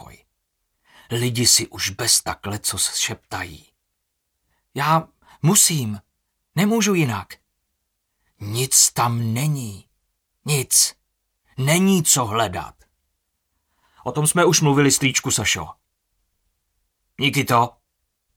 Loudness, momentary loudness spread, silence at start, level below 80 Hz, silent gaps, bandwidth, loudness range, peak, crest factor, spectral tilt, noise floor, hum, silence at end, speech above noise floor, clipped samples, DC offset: -18 LUFS; 16 LU; 1.1 s; -56 dBFS; none; 18.5 kHz; 3 LU; 0 dBFS; 22 dB; -3 dB/octave; -76 dBFS; none; 0.65 s; 56 dB; under 0.1%; under 0.1%